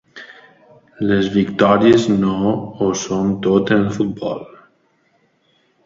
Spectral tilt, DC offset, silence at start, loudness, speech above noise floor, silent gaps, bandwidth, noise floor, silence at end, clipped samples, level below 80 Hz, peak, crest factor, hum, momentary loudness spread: -6 dB/octave; under 0.1%; 0.15 s; -17 LUFS; 45 dB; none; 7.8 kHz; -60 dBFS; 1.4 s; under 0.1%; -50 dBFS; 0 dBFS; 18 dB; none; 13 LU